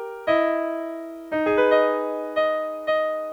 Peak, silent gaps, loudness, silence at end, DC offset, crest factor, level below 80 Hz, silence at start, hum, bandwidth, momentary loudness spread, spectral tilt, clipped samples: -8 dBFS; none; -23 LUFS; 0 s; under 0.1%; 16 dB; -62 dBFS; 0 s; none; 7.8 kHz; 11 LU; -5.5 dB/octave; under 0.1%